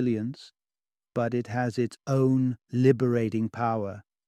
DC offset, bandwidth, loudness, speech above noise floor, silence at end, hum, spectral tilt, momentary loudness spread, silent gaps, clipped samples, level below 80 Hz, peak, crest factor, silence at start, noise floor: under 0.1%; 9.8 kHz; -27 LUFS; over 64 dB; 0.25 s; none; -8.5 dB/octave; 11 LU; none; under 0.1%; -68 dBFS; -8 dBFS; 18 dB; 0 s; under -90 dBFS